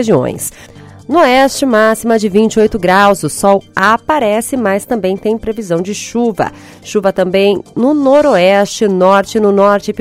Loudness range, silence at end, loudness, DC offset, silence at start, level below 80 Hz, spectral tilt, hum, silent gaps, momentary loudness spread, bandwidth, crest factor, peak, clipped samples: 4 LU; 0 s; -11 LUFS; under 0.1%; 0 s; -42 dBFS; -5 dB/octave; none; none; 8 LU; 16 kHz; 12 dB; 0 dBFS; 0.5%